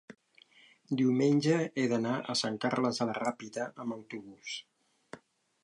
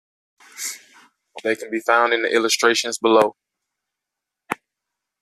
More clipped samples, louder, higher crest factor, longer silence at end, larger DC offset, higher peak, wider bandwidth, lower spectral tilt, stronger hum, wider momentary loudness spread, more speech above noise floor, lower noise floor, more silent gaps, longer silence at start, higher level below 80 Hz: neither; second, -32 LUFS vs -19 LUFS; about the same, 18 dB vs 20 dB; second, 0.5 s vs 0.65 s; neither; second, -16 dBFS vs -2 dBFS; second, 11.5 kHz vs 14.5 kHz; first, -5.5 dB/octave vs -1.5 dB/octave; neither; first, 18 LU vs 15 LU; second, 31 dB vs 66 dB; second, -62 dBFS vs -84 dBFS; neither; second, 0.1 s vs 0.55 s; second, -80 dBFS vs -72 dBFS